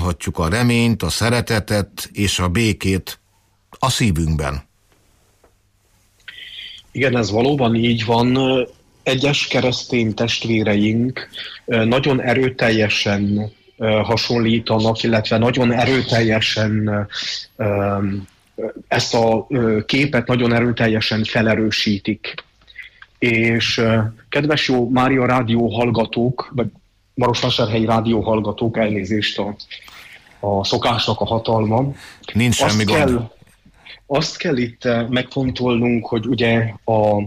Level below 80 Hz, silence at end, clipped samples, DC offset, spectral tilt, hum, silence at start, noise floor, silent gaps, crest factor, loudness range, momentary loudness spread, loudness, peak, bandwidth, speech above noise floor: -40 dBFS; 0 s; under 0.1%; under 0.1%; -5.5 dB/octave; none; 0 s; -59 dBFS; none; 14 dB; 4 LU; 11 LU; -18 LUFS; -4 dBFS; 15.5 kHz; 42 dB